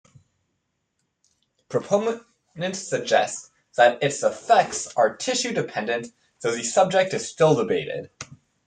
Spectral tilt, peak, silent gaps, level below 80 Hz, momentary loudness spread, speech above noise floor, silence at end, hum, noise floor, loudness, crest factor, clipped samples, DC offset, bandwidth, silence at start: -3.5 dB/octave; -4 dBFS; none; -68 dBFS; 14 LU; 53 dB; 0.35 s; none; -76 dBFS; -23 LUFS; 20 dB; under 0.1%; under 0.1%; 9.6 kHz; 1.7 s